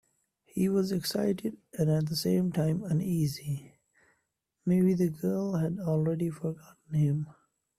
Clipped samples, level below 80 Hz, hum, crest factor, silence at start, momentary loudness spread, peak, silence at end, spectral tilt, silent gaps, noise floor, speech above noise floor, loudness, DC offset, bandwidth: under 0.1%; -64 dBFS; none; 14 dB; 0.55 s; 10 LU; -16 dBFS; 0.45 s; -7 dB/octave; none; -80 dBFS; 51 dB; -30 LUFS; under 0.1%; 15 kHz